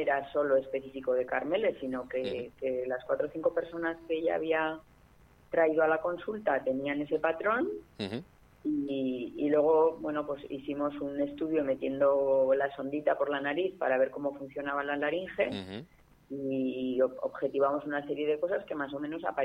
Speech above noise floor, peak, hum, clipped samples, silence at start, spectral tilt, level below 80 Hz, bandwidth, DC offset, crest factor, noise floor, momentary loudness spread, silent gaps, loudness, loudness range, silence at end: 29 dB; -14 dBFS; none; under 0.1%; 0 s; -7 dB/octave; -66 dBFS; 5.6 kHz; under 0.1%; 16 dB; -60 dBFS; 10 LU; none; -31 LUFS; 3 LU; 0 s